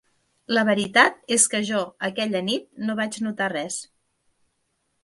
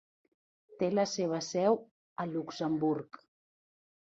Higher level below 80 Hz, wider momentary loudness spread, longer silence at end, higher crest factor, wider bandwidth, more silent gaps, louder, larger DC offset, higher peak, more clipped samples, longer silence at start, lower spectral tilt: first, -70 dBFS vs -78 dBFS; about the same, 11 LU vs 9 LU; first, 1.2 s vs 1 s; about the same, 22 dB vs 20 dB; first, 11.5 kHz vs 8 kHz; second, none vs 1.91-2.16 s; first, -22 LUFS vs -33 LUFS; neither; first, -4 dBFS vs -16 dBFS; neither; second, 0.5 s vs 0.7 s; second, -2.5 dB/octave vs -5.5 dB/octave